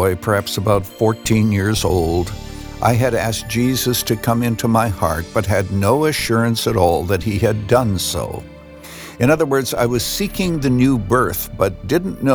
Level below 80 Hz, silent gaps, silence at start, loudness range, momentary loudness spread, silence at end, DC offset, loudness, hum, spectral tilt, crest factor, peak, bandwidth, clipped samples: -36 dBFS; none; 0 s; 1 LU; 5 LU; 0 s; under 0.1%; -17 LUFS; none; -5.5 dB/octave; 16 dB; -2 dBFS; over 20 kHz; under 0.1%